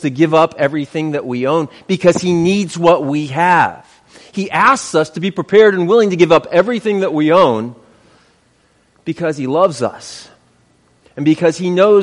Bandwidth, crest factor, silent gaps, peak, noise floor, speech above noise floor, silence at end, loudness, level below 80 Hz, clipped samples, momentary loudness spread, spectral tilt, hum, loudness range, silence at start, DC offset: 11.5 kHz; 14 dB; none; 0 dBFS; -55 dBFS; 42 dB; 0 s; -14 LUFS; -54 dBFS; under 0.1%; 11 LU; -5.5 dB/octave; none; 7 LU; 0 s; under 0.1%